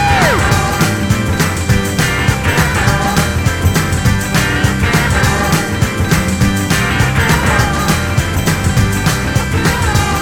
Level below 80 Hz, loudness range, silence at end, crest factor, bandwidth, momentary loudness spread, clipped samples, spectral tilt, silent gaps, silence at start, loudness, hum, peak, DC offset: -22 dBFS; 1 LU; 0 s; 12 dB; 18 kHz; 3 LU; under 0.1%; -4.5 dB/octave; none; 0 s; -13 LUFS; none; -2 dBFS; under 0.1%